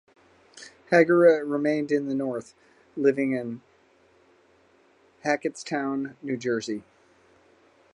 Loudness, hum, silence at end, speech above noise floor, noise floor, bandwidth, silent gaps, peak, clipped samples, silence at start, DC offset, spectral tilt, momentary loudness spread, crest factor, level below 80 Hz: -25 LUFS; none; 1.15 s; 36 dB; -61 dBFS; 10.5 kHz; none; -6 dBFS; under 0.1%; 0.55 s; under 0.1%; -6 dB/octave; 18 LU; 22 dB; -74 dBFS